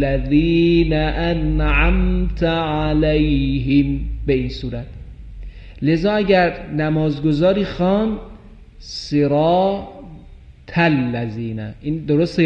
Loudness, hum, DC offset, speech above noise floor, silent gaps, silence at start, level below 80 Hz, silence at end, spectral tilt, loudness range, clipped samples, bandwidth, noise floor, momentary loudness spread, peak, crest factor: -18 LUFS; none; under 0.1%; 24 dB; none; 0 s; -26 dBFS; 0 s; -8 dB/octave; 3 LU; under 0.1%; 7.8 kHz; -41 dBFS; 15 LU; -2 dBFS; 16 dB